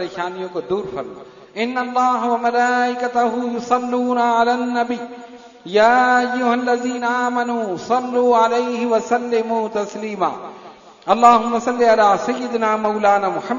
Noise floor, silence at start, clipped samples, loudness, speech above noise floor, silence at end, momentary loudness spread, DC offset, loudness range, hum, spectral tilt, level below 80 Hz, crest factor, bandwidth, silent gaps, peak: -41 dBFS; 0 s; under 0.1%; -18 LUFS; 24 dB; 0 s; 12 LU; under 0.1%; 3 LU; none; -4.5 dB/octave; -60 dBFS; 18 dB; 7.4 kHz; none; 0 dBFS